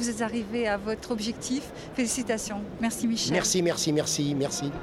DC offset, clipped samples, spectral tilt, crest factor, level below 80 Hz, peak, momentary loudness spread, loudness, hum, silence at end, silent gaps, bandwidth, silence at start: under 0.1%; under 0.1%; -3.5 dB/octave; 18 dB; -52 dBFS; -12 dBFS; 7 LU; -28 LUFS; none; 0 s; none; 16.5 kHz; 0 s